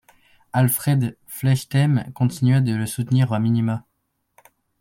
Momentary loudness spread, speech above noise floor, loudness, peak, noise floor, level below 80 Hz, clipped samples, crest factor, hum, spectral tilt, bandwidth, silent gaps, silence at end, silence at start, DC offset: 7 LU; 53 dB; -21 LUFS; -6 dBFS; -73 dBFS; -58 dBFS; under 0.1%; 16 dB; none; -6.5 dB/octave; 16.5 kHz; none; 1 s; 0.55 s; under 0.1%